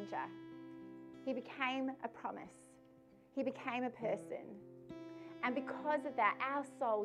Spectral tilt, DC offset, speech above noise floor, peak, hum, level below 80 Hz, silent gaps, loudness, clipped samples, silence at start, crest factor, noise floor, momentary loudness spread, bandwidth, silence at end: -5.5 dB/octave; under 0.1%; 24 dB; -20 dBFS; none; -82 dBFS; none; -40 LUFS; under 0.1%; 0 s; 22 dB; -64 dBFS; 18 LU; 11.5 kHz; 0 s